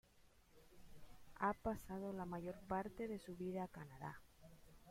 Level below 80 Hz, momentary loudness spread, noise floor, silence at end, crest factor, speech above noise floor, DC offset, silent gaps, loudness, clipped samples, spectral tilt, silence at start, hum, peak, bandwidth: -66 dBFS; 23 LU; -70 dBFS; 0 s; 22 dB; 24 dB; under 0.1%; none; -47 LUFS; under 0.1%; -7 dB/octave; 0.15 s; none; -28 dBFS; 16.5 kHz